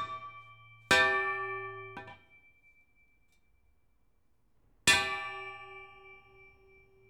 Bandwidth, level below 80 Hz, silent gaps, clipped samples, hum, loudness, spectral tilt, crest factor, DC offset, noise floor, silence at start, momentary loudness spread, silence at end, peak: 19.5 kHz; -66 dBFS; none; under 0.1%; none; -29 LUFS; -1 dB/octave; 26 dB; under 0.1%; -74 dBFS; 0 s; 24 LU; 0.9 s; -10 dBFS